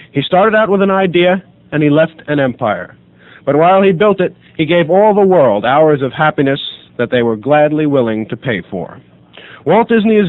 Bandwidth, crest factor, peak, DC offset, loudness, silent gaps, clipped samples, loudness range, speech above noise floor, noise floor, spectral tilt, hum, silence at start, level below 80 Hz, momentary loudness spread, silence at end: 4.2 kHz; 12 dB; 0 dBFS; under 0.1%; -12 LUFS; none; under 0.1%; 4 LU; 26 dB; -37 dBFS; -9 dB/octave; none; 0.15 s; -52 dBFS; 11 LU; 0 s